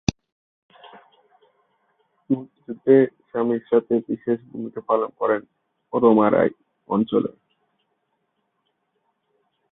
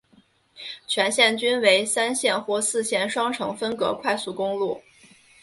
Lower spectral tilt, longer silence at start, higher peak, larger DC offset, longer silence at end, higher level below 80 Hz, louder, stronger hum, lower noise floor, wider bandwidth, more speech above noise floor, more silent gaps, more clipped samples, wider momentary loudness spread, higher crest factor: first, -7 dB/octave vs -1.5 dB/octave; second, 0.1 s vs 0.55 s; about the same, -2 dBFS vs -2 dBFS; neither; first, 2.4 s vs 0.6 s; first, -54 dBFS vs -68 dBFS; about the same, -22 LUFS vs -22 LUFS; neither; first, -73 dBFS vs -59 dBFS; second, 6.6 kHz vs 12 kHz; first, 53 dB vs 36 dB; first, 0.32-0.69 s vs none; neither; about the same, 11 LU vs 10 LU; about the same, 22 dB vs 22 dB